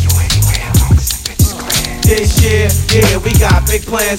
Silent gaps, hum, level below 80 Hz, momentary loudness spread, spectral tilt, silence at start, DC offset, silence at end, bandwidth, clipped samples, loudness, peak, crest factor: none; none; -16 dBFS; 4 LU; -4 dB/octave; 0 s; under 0.1%; 0 s; 17 kHz; under 0.1%; -11 LUFS; 0 dBFS; 10 dB